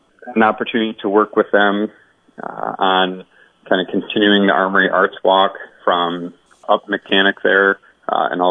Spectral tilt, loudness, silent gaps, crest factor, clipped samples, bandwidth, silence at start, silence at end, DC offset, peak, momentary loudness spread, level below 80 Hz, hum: -7 dB/octave; -16 LUFS; none; 16 dB; under 0.1%; 3.9 kHz; 0.25 s; 0 s; under 0.1%; -2 dBFS; 12 LU; -68 dBFS; none